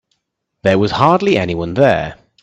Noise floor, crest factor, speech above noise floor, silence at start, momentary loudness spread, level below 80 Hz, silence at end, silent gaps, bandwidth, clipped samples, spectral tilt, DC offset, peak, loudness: -72 dBFS; 16 dB; 59 dB; 0.65 s; 7 LU; -46 dBFS; 0.3 s; none; 8.4 kHz; under 0.1%; -7 dB/octave; under 0.1%; 0 dBFS; -14 LUFS